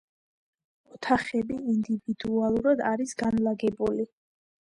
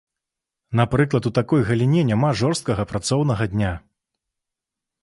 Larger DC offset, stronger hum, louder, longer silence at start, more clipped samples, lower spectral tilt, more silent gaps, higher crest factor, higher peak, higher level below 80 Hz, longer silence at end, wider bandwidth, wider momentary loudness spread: neither; neither; second, -27 LUFS vs -21 LUFS; first, 0.95 s vs 0.7 s; neither; about the same, -6 dB/octave vs -6.5 dB/octave; neither; about the same, 18 dB vs 18 dB; second, -10 dBFS vs -4 dBFS; second, -58 dBFS vs -44 dBFS; second, 0.65 s vs 1.25 s; about the same, 11 kHz vs 11.5 kHz; about the same, 6 LU vs 6 LU